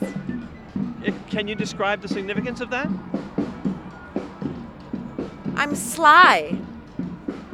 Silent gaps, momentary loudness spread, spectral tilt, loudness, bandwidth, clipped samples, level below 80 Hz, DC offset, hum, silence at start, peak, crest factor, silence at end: none; 19 LU; -4 dB/octave; -22 LUFS; 17 kHz; under 0.1%; -50 dBFS; under 0.1%; none; 0 s; -2 dBFS; 22 dB; 0 s